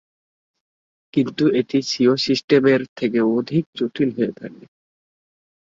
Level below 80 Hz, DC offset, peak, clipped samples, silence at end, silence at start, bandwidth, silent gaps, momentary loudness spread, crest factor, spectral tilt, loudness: -64 dBFS; under 0.1%; -4 dBFS; under 0.1%; 1.2 s; 1.15 s; 7.6 kHz; 2.44-2.48 s, 2.89-2.96 s, 3.66-3.73 s; 9 LU; 18 dB; -6 dB/octave; -19 LUFS